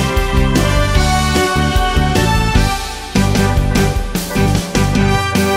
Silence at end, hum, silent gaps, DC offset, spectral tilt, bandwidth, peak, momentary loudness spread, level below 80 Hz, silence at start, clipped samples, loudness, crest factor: 0 s; none; none; under 0.1%; -5 dB/octave; 16.5 kHz; 0 dBFS; 3 LU; -18 dBFS; 0 s; under 0.1%; -14 LUFS; 14 dB